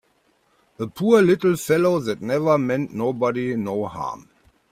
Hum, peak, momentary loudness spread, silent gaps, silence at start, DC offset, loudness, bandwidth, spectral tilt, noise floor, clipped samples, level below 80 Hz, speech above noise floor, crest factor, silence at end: none; -4 dBFS; 15 LU; none; 0.8 s; under 0.1%; -21 LUFS; 16 kHz; -6.5 dB/octave; -64 dBFS; under 0.1%; -60 dBFS; 43 dB; 18 dB; 0.55 s